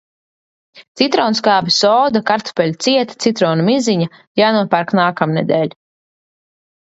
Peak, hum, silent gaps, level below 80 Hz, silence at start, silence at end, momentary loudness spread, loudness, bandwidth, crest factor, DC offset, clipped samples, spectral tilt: 0 dBFS; none; 0.88-0.95 s, 4.27-4.35 s; -60 dBFS; 0.75 s; 1.15 s; 6 LU; -15 LUFS; 8 kHz; 16 dB; under 0.1%; under 0.1%; -5 dB/octave